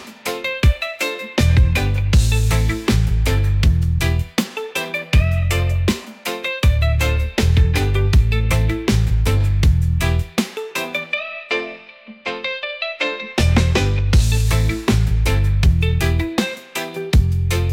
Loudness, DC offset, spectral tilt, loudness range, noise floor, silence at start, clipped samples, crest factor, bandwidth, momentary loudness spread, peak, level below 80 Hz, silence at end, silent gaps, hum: -19 LUFS; under 0.1%; -5.5 dB/octave; 4 LU; -40 dBFS; 0 s; under 0.1%; 12 dB; 17 kHz; 8 LU; -4 dBFS; -22 dBFS; 0 s; none; none